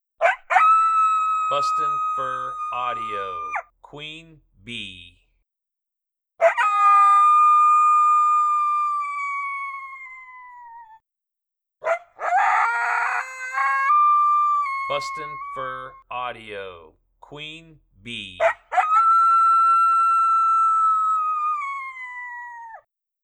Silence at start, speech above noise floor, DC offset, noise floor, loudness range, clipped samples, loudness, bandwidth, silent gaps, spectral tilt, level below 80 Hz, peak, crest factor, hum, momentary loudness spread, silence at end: 0.2 s; 57 dB; under 0.1%; -85 dBFS; 14 LU; under 0.1%; -19 LUFS; 10 kHz; none; -2 dB/octave; -64 dBFS; -4 dBFS; 18 dB; none; 20 LU; 0.45 s